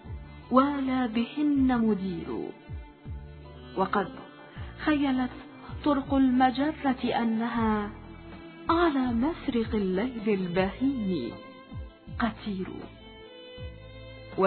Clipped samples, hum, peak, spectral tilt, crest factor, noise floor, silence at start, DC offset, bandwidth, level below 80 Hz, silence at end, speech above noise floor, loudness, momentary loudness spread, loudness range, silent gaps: under 0.1%; none; -8 dBFS; -10.5 dB/octave; 20 dB; -47 dBFS; 0.05 s; under 0.1%; 4.5 kHz; -48 dBFS; 0 s; 20 dB; -28 LUFS; 21 LU; 6 LU; none